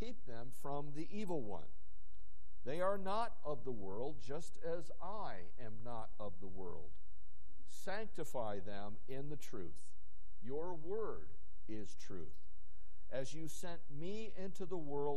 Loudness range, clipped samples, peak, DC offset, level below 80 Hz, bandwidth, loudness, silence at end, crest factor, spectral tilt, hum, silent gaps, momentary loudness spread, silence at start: 6 LU; under 0.1%; -22 dBFS; 3%; -64 dBFS; 12.5 kHz; -47 LUFS; 0 s; 22 dB; -6 dB/octave; none; none; 12 LU; 0 s